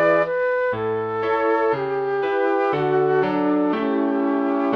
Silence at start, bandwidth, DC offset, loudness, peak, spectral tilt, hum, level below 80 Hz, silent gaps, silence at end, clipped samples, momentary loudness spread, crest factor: 0 s; 6.2 kHz; under 0.1%; -21 LUFS; -6 dBFS; -8 dB/octave; none; -60 dBFS; none; 0 s; under 0.1%; 4 LU; 14 dB